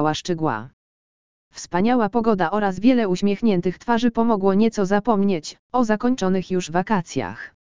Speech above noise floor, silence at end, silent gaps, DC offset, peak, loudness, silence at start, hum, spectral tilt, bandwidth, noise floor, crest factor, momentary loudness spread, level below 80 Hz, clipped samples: over 70 dB; 0.25 s; 0.73-1.51 s, 5.59-5.70 s; 2%; -4 dBFS; -21 LUFS; 0 s; none; -6 dB/octave; 7.6 kHz; under -90 dBFS; 16 dB; 9 LU; -52 dBFS; under 0.1%